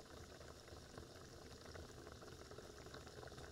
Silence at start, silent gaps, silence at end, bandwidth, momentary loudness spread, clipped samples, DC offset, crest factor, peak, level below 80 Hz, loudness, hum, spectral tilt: 0 s; none; 0 s; 16 kHz; 2 LU; under 0.1%; under 0.1%; 20 dB; -38 dBFS; -66 dBFS; -57 LUFS; none; -4 dB/octave